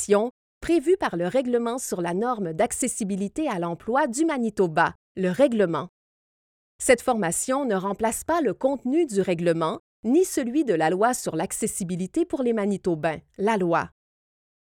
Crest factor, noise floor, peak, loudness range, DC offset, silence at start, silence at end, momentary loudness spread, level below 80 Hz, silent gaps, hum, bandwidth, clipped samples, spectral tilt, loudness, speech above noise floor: 20 dB; under -90 dBFS; -6 dBFS; 2 LU; under 0.1%; 0 s; 0.8 s; 6 LU; -56 dBFS; 0.31-0.61 s, 4.95-5.15 s, 5.89-6.79 s, 9.80-10.03 s; none; 17.5 kHz; under 0.1%; -5 dB/octave; -24 LUFS; over 66 dB